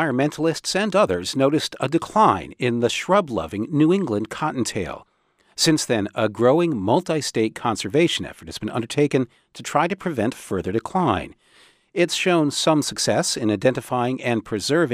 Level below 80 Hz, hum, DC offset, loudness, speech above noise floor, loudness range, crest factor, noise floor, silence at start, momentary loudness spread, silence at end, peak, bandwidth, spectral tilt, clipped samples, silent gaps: -54 dBFS; none; under 0.1%; -21 LUFS; 34 dB; 3 LU; 18 dB; -55 dBFS; 0 s; 8 LU; 0 s; -4 dBFS; 15.5 kHz; -4.5 dB/octave; under 0.1%; none